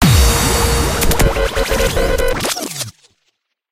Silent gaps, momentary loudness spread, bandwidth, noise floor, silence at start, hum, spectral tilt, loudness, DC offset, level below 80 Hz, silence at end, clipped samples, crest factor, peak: none; 9 LU; 16.5 kHz; -67 dBFS; 0 s; none; -4 dB/octave; -15 LUFS; under 0.1%; -20 dBFS; 0.8 s; under 0.1%; 14 dB; 0 dBFS